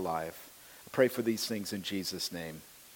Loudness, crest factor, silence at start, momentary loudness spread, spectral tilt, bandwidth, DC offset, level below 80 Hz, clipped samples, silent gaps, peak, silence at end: -34 LUFS; 22 dB; 0 s; 20 LU; -4 dB/octave; 17 kHz; under 0.1%; -70 dBFS; under 0.1%; none; -12 dBFS; 0 s